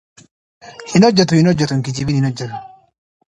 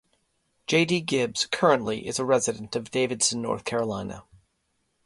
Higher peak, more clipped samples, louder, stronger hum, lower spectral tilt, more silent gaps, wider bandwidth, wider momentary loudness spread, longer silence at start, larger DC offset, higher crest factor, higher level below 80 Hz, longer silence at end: first, 0 dBFS vs -6 dBFS; neither; first, -15 LUFS vs -25 LUFS; neither; first, -6 dB/octave vs -3.5 dB/octave; neither; about the same, 10.5 kHz vs 11.5 kHz; first, 17 LU vs 11 LU; about the same, 0.65 s vs 0.7 s; neither; second, 16 dB vs 22 dB; first, -48 dBFS vs -60 dBFS; second, 0.65 s vs 0.85 s